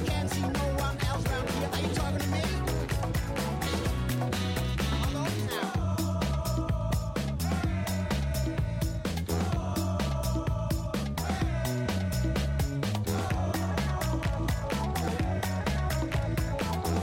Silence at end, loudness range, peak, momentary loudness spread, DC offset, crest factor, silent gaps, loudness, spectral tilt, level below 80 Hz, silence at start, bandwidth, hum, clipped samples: 0 s; 1 LU; -18 dBFS; 2 LU; under 0.1%; 10 dB; none; -30 LUFS; -5.5 dB/octave; -36 dBFS; 0 s; 16.5 kHz; none; under 0.1%